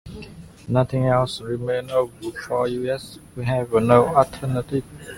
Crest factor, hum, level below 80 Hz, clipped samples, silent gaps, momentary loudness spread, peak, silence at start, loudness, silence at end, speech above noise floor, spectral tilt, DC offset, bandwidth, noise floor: 20 dB; none; -48 dBFS; under 0.1%; none; 18 LU; -2 dBFS; 0.05 s; -22 LUFS; 0 s; 19 dB; -7 dB/octave; under 0.1%; 16 kHz; -40 dBFS